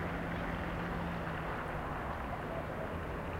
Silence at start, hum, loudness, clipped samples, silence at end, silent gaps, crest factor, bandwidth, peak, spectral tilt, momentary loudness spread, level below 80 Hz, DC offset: 0 s; none; -39 LUFS; under 0.1%; 0 s; none; 14 dB; 16 kHz; -26 dBFS; -7 dB/octave; 2 LU; -48 dBFS; under 0.1%